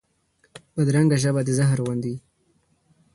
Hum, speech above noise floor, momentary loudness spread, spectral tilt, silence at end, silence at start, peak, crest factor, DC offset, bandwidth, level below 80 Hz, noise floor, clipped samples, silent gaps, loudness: none; 45 dB; 14 LU; -6.5 dB/octave; 0.95 s; 0.55 s; -8 dBFS; 16 dB; under 0.1%; 11.5 kHz; -58 dBFS; -65 dBFS; under 0.1%; none; -22 LUFS